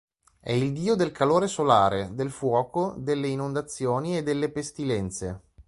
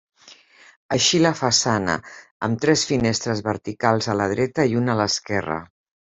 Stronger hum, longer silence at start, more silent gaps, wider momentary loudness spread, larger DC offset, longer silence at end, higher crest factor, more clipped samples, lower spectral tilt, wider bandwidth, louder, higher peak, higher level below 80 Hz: neither; first, 0.45 s vs 0.25 s; second, none vs 0.76-0.89 s, 2.31-2.40 s; about the same, 10 LU vs 9 LU; neither; second, 0.05 s vs 0.5 s; about the same, 22 dB vs 18 dB; neither; first, -6 dB/octave vs -4 dB/octave; first, 11.5 kHz vs 8.2 kHz; second, -26 LUFS vs -21 LUFS; about the same, -4 dBFS vs -4 dBFS; about the same, -54 dBFS vs -56 dBFS